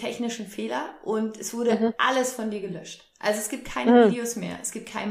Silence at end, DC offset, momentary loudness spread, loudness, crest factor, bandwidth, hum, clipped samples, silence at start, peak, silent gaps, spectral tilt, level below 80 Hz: 0 s; under 0.1%; 14 LU; -25 LUFS; 20 dB; 15.5 kHz; none; under 0.1%; 0 s; -6 dBFS; none; -4 dB/octave; -58 dBFS